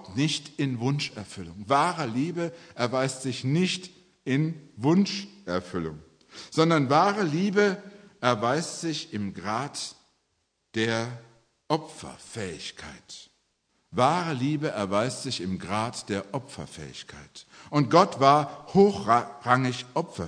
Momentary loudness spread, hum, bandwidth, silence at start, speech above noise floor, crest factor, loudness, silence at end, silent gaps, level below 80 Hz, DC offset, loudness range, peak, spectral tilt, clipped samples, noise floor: 19 LU; none; 10.5 kHz; 0 s; 49 dB; 24 dB; -26 LUFS; 0 s; none; -64 dBFS; under 0.1%; 8 LU; -4 dBFS; -5.5 dB/octave; under 0.1%; -75 dBFS